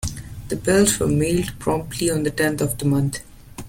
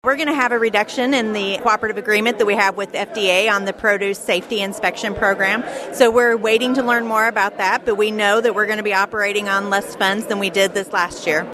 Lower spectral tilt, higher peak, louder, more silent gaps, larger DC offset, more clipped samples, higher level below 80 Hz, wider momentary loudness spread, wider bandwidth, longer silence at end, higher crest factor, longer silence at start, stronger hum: first, -5 dB/octave vs -3 dB/octave; second, -4 dBFS vs 0 dBFS; second, -21 LUFS vs -17 LUFS; neither; neither; neither; first, -40 dBFS vs -54 dBFS; first, 14 LU vs 5 LU; about the same, 17 kHz vs 15.5 kHz; about the same, 0 s vs 0 s; about the same, 16 dB vs 18 dB; about the same, 0 s vs 0.05 s; neither